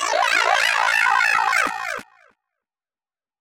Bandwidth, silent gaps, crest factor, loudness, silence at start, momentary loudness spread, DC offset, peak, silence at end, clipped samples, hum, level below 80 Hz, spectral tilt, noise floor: over 20 kHz; none; 18 dB; -18 LUFS; 0 s; 12 LU; under 0.1%; -4 dBFS; 1.4 s; under 0.1%; none; -64 dBFS; 1 dB/octave; under -90 dBFS